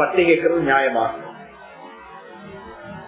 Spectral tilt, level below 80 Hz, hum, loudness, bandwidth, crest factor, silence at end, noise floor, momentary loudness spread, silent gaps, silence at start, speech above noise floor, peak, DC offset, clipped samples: -9 dB/octave; -56 dBFS; none; -18 LUFS; 4 kHz; 18 dB; 0 s; -41 dBFS; 24 LU; none; 0 s; 23 dB; -4 dBFS; under 0.1%; under 0.1%